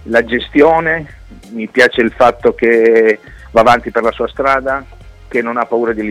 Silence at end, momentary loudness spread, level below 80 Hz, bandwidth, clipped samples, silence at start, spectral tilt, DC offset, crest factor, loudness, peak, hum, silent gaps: 0 s; 10 LU; -38 dBFS; 12 kHz; under 0.1%; 0.05 s; -5.5 dB/octave; under 0.1%; 12 dB; -12 LUFS; 0 dBFS; none; none